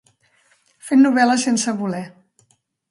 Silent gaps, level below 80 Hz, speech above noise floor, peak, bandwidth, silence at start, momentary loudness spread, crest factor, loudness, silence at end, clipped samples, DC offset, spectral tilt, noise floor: none; -68 dBFS; 46 dB; -2 dBFS; 11.5 kHz; 0.85 s; 20 LU; 18 dB; -17 LUFS; 0.85 s; under 0.1%; under 0.1%; -4 dB/octave; -63 dBFS